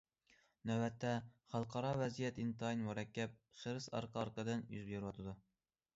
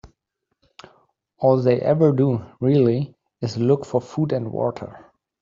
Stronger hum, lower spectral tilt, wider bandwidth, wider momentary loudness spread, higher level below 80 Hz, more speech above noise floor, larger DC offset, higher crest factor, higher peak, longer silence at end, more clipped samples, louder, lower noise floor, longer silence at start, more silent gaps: neither; second, -6 dB/octave vs -9 dB/octave; about the same, 7.6 kHz vs 7.6 kHz; second, 8 LU vs 12 LU; second, -72 dBFS vs -60 dBFS; second, 32 dB vs 57 dB; neither; about the same, 16 dB vs 18 dB; second, -28 dBFS vs -4 dBFS; about the same, 0.55 s vs 0.45 s; neither; second, -44 LUFS vs -21 LUFS; about the same, -75 dBFS vs -76 dBFS; first, 0.65 s vs 0.05 s; neither